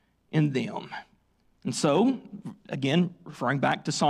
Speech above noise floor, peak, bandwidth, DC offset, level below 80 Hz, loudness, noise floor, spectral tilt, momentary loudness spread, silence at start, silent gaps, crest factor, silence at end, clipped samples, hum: 40 dB; -12 dBFS; 13 kHz; under 0.1%; -68 dBFS; -28 LUFS; -66 dBFS; -5.5 dB/octave; 16 LU; 0.3 s; none; 16 dB; 0 s; under 0.1%; none